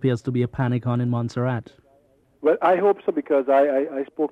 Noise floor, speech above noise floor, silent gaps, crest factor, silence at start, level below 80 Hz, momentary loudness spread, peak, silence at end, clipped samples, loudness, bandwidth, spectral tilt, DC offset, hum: -60 dBFS; 38 dB; none; 14 dB; 0 s; -58 dBFS; 8 LU; -8 dBFS; 0.05 s; under 0.1%; -22 LUFS; 8.4 kHz; -9 dB/octave; under 0.1%; none